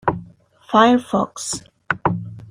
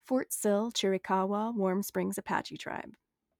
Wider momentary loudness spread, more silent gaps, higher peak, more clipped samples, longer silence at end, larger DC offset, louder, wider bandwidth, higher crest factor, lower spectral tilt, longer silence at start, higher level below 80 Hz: first, 15 LU vs 11 LU; neither; first, -2 dBFS vs -14 dBFS; neither; second, 0.05 s vs 0.5 s; neither; first, -19 LUFS vs -32 LUFS; second, 15 kHz vs over 20 kHz; about the same, 18 dB vs 18 dB; about the same, -4.5 dB/octave vs -4.5 dB/octave; about the same, 0.05 s vs 0.05 s; first, -52 dBFS vs -74 dBFS